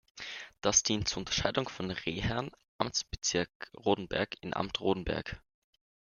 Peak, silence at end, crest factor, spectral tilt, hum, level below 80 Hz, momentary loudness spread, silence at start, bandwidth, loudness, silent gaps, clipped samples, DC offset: -10 dBFS; 0.8 s; 24 dB; -3 dB/octave; none; -52 dBFS; 14 LU; 0.15 s; 10.5 kHz; -33 LUFS; 2.68-2.79 s, 3.55-3.60 s; under 0.1%; under 0.1%